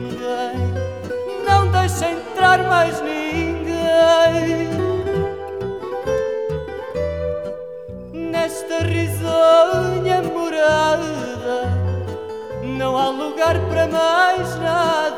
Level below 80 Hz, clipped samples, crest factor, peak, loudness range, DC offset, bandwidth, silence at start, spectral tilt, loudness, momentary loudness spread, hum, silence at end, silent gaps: -42 dBFS; under 0.1%; 18 dB; -2 dBFS; 7 LU; 0.2%; 16 kHz; 0 s; -5.5 dB/octave; -19 LUFS; 13 LU; none; 0 s; none